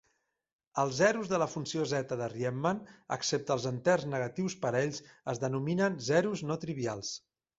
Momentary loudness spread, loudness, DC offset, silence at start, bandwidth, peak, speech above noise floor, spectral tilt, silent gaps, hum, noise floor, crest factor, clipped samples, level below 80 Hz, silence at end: 11 LU; -32 LUFS; under 0.1%; 0.75 s; 8 kHz; -14 dBFS; 47 dB; -5 dB/octave; none; none; -79 dBFS; 20 dB; under 0.1%; -68 dBFS; 0.4 s